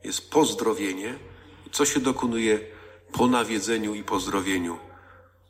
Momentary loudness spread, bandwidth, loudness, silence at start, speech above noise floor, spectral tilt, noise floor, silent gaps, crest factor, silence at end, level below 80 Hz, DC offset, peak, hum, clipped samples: 13 LU; 16 kHz; -25 LUFS; 0.05 s; 28 dB; -3.5 dB/octave; -53 dBFS; none; 18 dB; 0.5 s; -56 dBFS; under 0.1%; -8 dBFS; none; under 0.1%